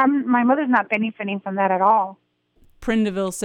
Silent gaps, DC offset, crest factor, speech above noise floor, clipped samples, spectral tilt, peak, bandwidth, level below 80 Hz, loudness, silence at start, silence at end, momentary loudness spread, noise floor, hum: none; under 0.1%; 16 dB; 37 dB; under 0.1%; -5.5 dB/octave; -4 dBFS; 15 kHz; -52 dBFS; -20 LUFS; 0 s; 0 s; 9 LU; -57 dBFS; none